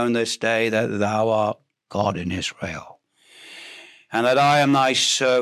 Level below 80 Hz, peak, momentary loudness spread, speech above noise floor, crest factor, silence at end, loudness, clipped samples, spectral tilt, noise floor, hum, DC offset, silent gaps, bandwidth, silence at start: -52 dBFS; -6 dBFS; 21 LU; 32 dB; 16 dB; 0 s; -20 LUFS; under 0.1%; -3.5 dB/octave; -52 dBFS; none; under 0.1%; none; 15 kHz; 0 s